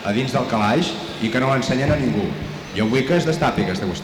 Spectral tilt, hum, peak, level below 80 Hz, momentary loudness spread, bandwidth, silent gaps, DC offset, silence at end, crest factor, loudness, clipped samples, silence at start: -6 dB/octave; none; -6 dBFS; -42 dBFS; 6 LU; 19.5 kHz; none; under 0.1%; 0 s; 14 dB; -20 LUFS; under 0.1%; 0 s